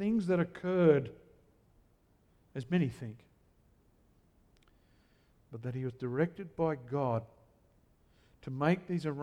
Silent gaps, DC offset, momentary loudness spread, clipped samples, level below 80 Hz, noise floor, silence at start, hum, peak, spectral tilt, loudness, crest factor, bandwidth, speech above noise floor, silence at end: none; under 0.1%; 19 LU; under 0.1%; -66 dBFS; -68 dBFS; 0 s; none; -14 dBFS; -8.5 dB/octave; -33 LUFS; 22 dB; 9.8 kHz; 36 dB; 0 s